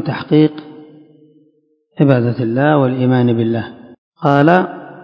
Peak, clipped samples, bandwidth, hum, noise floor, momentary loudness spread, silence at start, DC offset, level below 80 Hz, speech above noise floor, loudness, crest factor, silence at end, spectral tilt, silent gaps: 0 dBFS; 0.2%; 6 kHz; none; -58 dBFS; 10 LU; 0 s; under 0.1%; -58 dBFS; 45 dB; -14 LUFS; 16 dB; 0 s; -10 dB/octave; 3.98-4.12 s